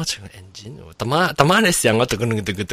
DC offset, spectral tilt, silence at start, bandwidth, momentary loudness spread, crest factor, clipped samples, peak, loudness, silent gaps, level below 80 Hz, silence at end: under 0.1%; -4 dB/octave; 0 s; 16 kHz; 23 LU; 20 dB; under 0.1%; 0 dBFS; -17 LUFS; none; -46 dBFS; 0 s